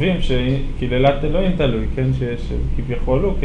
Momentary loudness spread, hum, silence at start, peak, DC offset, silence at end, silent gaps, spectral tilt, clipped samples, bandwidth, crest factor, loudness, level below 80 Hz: 7 LU; none; 0 s; -4 dBFS; under 0.1%; 0 s; none; -8 dB/octave; under 0.1%; 7.2 kHz; 14 dB; -20 LUFS; -22 dBFS